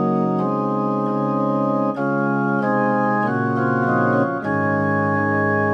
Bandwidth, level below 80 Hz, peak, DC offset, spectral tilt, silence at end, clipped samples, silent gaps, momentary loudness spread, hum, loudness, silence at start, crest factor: 6.6 kHz; -62 dBFS; -6 dBFS; under 0.1%; -9.5 dB/octave; 0 s; under 0.1%; none; 3 LU; none; -20 LUFS; 0 s; 12 dB